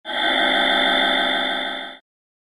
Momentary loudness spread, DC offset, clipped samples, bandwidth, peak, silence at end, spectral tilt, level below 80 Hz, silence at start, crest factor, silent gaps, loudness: 12 LU; under 0.1%; under 0.1%; 13 kHz; -6 dBFS; 0.45 s; -2.5 dB/octave; -60 dBFS; 0.05 s; 14 dB; none; -18 LUFS